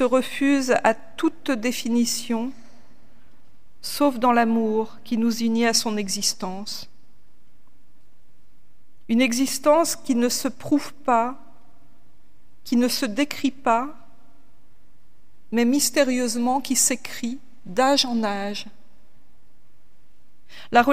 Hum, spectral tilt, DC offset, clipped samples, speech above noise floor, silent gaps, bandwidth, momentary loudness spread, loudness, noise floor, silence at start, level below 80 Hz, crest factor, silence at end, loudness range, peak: none; -2.5 dB/octave; 2%; under 0.1%; 39 dB; none; 16 kHz; 12 LU; -22 LUFS; -61 dBFS; 0 s; -62 dBFS; 22 dB; 0 s; 4 LU; -2 dBFS